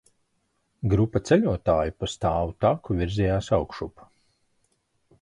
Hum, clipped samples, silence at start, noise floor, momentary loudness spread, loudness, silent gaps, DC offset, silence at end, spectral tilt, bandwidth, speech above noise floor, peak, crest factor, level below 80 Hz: none; under 0.1%; 0.8 s; -72 dBFS; 10 LU; -25 LUFS; none; under 0.1%; 1.35 s; -7 dB/octave; 11 kHz; 49 dB; -8 dBFS; 18 dB; -40 dBFS